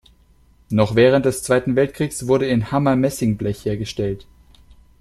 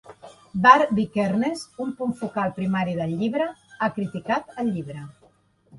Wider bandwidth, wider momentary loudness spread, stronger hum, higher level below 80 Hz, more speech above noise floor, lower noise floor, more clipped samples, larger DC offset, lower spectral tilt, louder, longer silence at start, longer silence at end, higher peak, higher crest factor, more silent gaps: first, 13.5 kHz vs 11.5 kHz; second, 10 LU vs 16 LU; neither; first, -46 dBFS vs -62 dBFS; about the same, 35 dB vs 37 dB; second, -53 dBFS vs -60 dBFS; neither; neither; about the same, -6 dB/octave vs -6.5 dB/octave; first, -19 LUFS vs -23 LUFS; first, 0.7 s vs 0.05 s; first, 0.8 s vs 0 s; about the same, -2 dBFS vs -2 dBFS; about the same, 18 dB vs 22 dB; neither